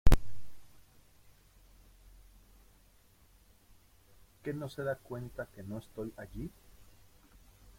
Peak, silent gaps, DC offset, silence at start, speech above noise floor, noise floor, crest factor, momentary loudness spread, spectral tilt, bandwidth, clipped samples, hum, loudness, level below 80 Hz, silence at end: -8 dBFS; none; under 0.1%; 0.05 s; 22 dB; -63 dBFS; 24 dB; 25 LU; -6.5 dB/octave; 16.5 kHz; under 0.1%; none; -40 LUFS; -40 dBFS; 1.3 s